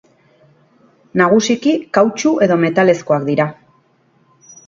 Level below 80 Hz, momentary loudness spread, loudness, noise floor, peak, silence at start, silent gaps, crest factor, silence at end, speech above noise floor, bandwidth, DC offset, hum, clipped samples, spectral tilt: -58 dBFS; 5 LU; -15 LUFS; -56 dBFS; 0 dBFS; 1.15 s; none; 16 dB; 1.15 s; 43 dB; 7.6 kHz; under 0.1%; none; under 0.1%; -5.5 dB/octave